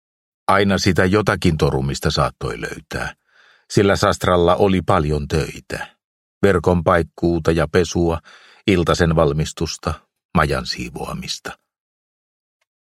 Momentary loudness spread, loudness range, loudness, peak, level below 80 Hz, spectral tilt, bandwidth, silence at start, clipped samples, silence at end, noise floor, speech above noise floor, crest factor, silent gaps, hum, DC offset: 12 LU; 3 LU; -19 LUFS; 0 dBFS; -36 dBFS; -5.5 dB/octave; 15 kHz; 0.5 s; under 0.1%; 1.4 s; -54 dBFS; 37 dB; 20 dB; 6.04-6.41 s, 10.25-10.29 s; none; under 0.1%